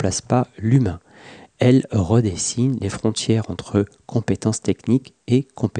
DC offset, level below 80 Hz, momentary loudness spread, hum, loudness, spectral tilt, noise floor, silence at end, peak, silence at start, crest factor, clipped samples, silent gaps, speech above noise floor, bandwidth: under 0.1%; -48 dBFS; 6 LU; none; -20 LUFS; -6 dB/octave; -44 dBFS; 0 s; -4 dBFS; 0 s; 16 dB; under 0.1%; none; 25 dB; 10 kHz